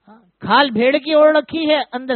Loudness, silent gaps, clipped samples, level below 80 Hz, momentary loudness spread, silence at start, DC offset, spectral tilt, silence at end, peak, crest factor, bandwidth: -15 LUFS; none; under 0.1%; -62 dBFS; 6 LU; 0.4 s; under 0.1%; -2 dB/octave; 0 s; 0 dBFS; 16 dB; 4.5 kHz